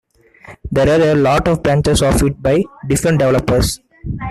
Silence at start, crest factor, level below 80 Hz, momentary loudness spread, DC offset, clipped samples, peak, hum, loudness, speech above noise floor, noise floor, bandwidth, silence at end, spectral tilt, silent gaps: 0.5 s; 12 dB; -28 dBFS; 10 LU; under 0.1%; under 0.1%; -2 dBFS; none; -14 LUFS; 28 dB; -41 dBFS; 14.5 kHz; 0 s; -5.5 dB/octave; none